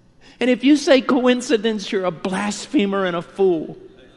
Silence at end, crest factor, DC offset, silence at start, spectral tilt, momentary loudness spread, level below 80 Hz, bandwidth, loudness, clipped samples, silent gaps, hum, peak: 0.3 s; 16 dB; under 0.1%; 0.4 s; -4.5 dB/octave; 9 LU; -56 dBFS; 11.5 kHz; -19 LUFS; under 0.1%; none; none; -4 dBFS